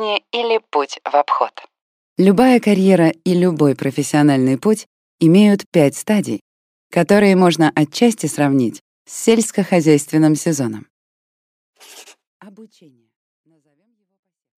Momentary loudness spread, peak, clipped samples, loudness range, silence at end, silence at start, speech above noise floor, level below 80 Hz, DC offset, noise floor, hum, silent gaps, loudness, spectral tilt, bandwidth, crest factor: 9 LU; 0 dBFS; under 0.1%; 5 LU; 1.95 s; 0 s; 52 dB; -62 dBFS; under 0.1%; -67 dBFS; none; 1.81-2.16 s, 4.86-5.18 s, 5.66-5.72 s, 6.41-6.90 s, 8.81-9.05 s, 10.90-11.73 s, 12.27-12.40 s; -15 LUFS; -6 dB/octave; 16 kHz; 16 dB